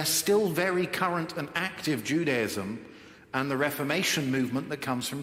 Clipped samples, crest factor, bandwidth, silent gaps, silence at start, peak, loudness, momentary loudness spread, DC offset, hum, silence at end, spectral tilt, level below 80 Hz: under 0.1%; 18 dB; 16.5 kHz; none; 0 s; -12 dBFS; -28 LUFS; 8 LU; under 0.1%; none; 0 s; -4 dB/octave; -68 dBFS